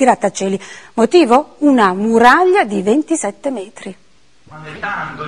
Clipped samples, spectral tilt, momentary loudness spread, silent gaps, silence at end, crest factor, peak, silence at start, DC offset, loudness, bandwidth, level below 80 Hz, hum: 0.2%; -4.5 dB/octave; 17 LU; none; 0 s; 14 dB; 0 dBFS; 0 s; 0.5%; -13 LUFS; 12 kHz; -52 dBFS; none